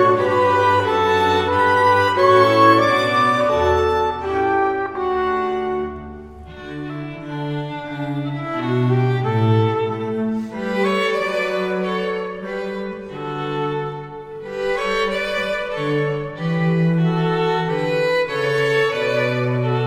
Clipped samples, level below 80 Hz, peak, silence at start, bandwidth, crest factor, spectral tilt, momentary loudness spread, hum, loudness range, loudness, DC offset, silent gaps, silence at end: under 0.1%; -46 dBFS; -2 dBFS; 0 s; 15.5 kHz; 18 dB; -6.5 dB/octave; 14 LU; none; 10 LU; -19 LUFS; under 0.1%; none; 0 s